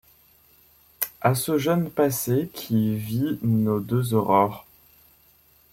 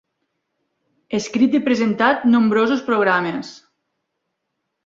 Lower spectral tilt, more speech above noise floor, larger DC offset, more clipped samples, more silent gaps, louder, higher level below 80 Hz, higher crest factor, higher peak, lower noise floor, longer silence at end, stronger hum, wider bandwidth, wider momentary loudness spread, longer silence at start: about the same, -6.5 dB/octave vs -5.5 dB/octave; second, 35 dB vs 59 dB; neither; neither; neither; second, -24 LUFS vs -18 LUFS; first, -58 dBFS vs -64 dBFS; about the same, 22 dB vs 18 dB; about the same, -2 dBFS vs -2 dBFS; second, -58 dBFS vs -76 dBFS; second, 1.1 s vs 1.3 s; neither; first, 16.5 kHz vs 7.6 kHz; second, 6 LU vs 11 LU; about the same, 1 s vs 1.1 s